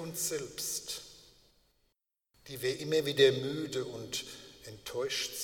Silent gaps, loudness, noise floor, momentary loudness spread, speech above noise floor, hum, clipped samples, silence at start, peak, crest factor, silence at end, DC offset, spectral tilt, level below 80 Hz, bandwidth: none; -33 LUFS; -79 dBFS; 20 LU; 46 dB; none; under 0.1%; 0 s; -12 dBFS; 22 dB; 0 s; under 0.1%; -3 dB/octave; -68 dBFS; 19 kHz